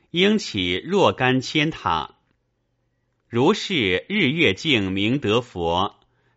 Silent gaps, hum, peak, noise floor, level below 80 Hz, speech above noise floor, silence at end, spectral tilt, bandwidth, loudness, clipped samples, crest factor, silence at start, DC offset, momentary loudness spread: none; none; -2 dBFS; -71 dBFS; -52 dBFS; 50 dB; 0.45 s; -3 dB/octave; 8 kHz; -21 LUFS; under 0.1%; 20 dB; 0.15 s; under 0.1%; 6 LU